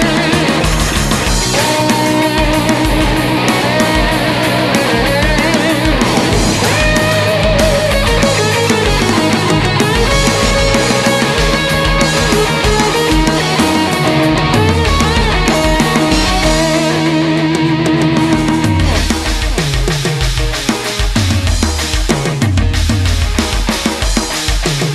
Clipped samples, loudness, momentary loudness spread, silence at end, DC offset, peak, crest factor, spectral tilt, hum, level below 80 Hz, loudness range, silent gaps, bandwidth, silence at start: under 0.1%; -12 LUFS; 4 LU; 0 s; 0.2%; 0 dBFS; 12 dB; -4.5 dB/octave; none; -20 dBFS; 3 LU; none; 13 kHz; 0 s